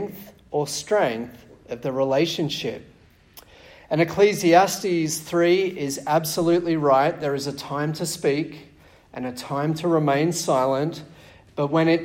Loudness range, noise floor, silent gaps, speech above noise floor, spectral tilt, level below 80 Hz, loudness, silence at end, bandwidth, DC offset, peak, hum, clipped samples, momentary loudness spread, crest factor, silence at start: 5 LU; -50 dBFS; none; 28 dB; -5 dB/octave; -58 dBFS; -22 LUFS; 0 s; 16.5 kHz; under 0.1%; -2 dBFS; none; under 0.1%; 14 LU; 20 dB; 0 s